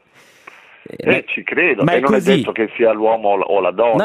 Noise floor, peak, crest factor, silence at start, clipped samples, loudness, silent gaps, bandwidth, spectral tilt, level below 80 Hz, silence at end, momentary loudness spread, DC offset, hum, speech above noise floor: -44 dBFS; 0 dBFS; 16 dB; 0.95 s; under 0.1%; -16 LUFS; none; 14.5 kHz; -6.5 dB/octave; -58 dBFS; 0 s; 4 LU; under 0.1%; none; 29 dB